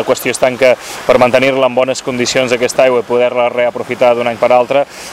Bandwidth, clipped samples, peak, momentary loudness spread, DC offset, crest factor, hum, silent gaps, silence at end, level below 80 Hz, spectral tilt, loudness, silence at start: 15.5 kHz; 0.2%; 0 dBFS; 5 LU; under 0.1%; 12 dB; none; none; 0 s; -48 dBFS; -3.5 dB/octave; -12 LUFS; 0 s